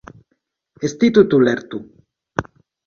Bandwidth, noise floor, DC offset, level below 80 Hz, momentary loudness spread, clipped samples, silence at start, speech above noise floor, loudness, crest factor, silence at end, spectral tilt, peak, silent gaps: 7 kHz; -70 dBFS; under 0.1%; -50 dBFS; 17 LU; under 0.1%; 0.8 s; 55 dB; -17 LUFS; 20 dB; 0.45 s; -6.5 dB/octave; 0 dBFS; none